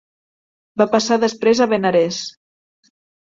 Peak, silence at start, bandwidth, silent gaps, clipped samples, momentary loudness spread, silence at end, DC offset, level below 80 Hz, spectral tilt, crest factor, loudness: -2 dBFS; 0.75 s; 7.8 kHz; none; under 0.1%; 12 LU; 1.05 s; under 0.1%; -62 dBFS; -4.5 dB/octave; 18 dB; -17 LUFS